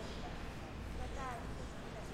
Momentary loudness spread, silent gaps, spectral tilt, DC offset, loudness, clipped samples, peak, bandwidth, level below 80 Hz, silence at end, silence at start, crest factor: 3 LU; none; -5.5 dB/octave; under 0.1%; -46 LUFS; under 0.1%; -30 dBFS; 16 kHz; -48 dBFS; 0 s; 0 s; 14 dB